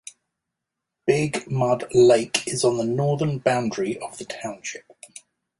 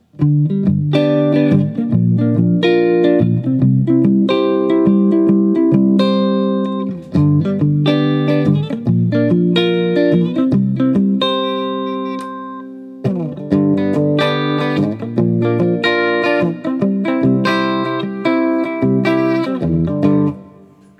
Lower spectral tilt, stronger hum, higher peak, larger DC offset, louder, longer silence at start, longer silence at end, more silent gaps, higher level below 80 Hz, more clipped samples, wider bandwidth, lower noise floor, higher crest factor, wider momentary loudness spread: second, -5 dB/octave vs -8.5 dB/octave; neither; about the same, -2 dBFS vs 0 dBFS; neither; second, -22 LUFS vs -15 LUFS; first, 1.05 s vs 0.2 s; first, 0.8 s vs 0.5 s; neither; second, -60 dBFS vs -52 dBFS; neither; first, 11.5 kHz vs 9 kHz; first, -84 dBFS vs -43 dBFS; first, 22 dB vs 14 dB; first, 21 LU vs 7 LU